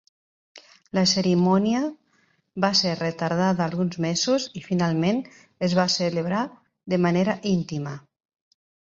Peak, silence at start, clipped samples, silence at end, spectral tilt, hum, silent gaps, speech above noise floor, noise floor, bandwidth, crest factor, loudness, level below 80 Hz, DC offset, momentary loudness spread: -4 dBFS; 0.55 s; under 0.1%; 0.95 s; -5 dB/octave; none; none; 43 dB; -66 dBFS; 7.8 kHz; 20 dB; -23 LUFS; -62 dBFS; under 0.1%; 11 LU